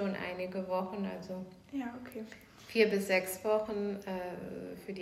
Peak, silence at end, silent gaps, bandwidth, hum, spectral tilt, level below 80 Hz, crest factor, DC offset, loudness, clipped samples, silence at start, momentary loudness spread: -14 dBFS; 0 s; none; 16 kHz; none; -5 dB/octave; -68 dBFS; 20 dB; under 0.1%; -35 LUFS; under 0.1%; 0 s; 15 LU